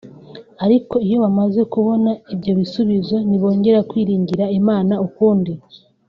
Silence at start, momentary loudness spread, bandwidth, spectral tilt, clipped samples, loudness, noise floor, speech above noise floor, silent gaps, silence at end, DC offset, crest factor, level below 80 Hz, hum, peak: 0.05 s; 5 LU; 5.6 kHz; -8.5 dB/octave; under 0.1%; -17 LUFS; -39 dBFS; 23 dB; none; 0.3 s; under 0.1%; 14 dB; -56 dBFS; none; -2 dBFS